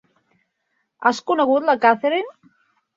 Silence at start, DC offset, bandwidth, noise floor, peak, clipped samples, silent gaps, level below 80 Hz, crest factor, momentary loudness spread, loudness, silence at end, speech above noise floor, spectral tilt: 1 s; under 0.1%; 7.8 kHz; -72 dBFS; -2 dBFS; under 0.1%; none; -70 dBFS; 20 dB; 7 LU; -19 LUFS; 0.65 s; 54 dB; -4 dB/octave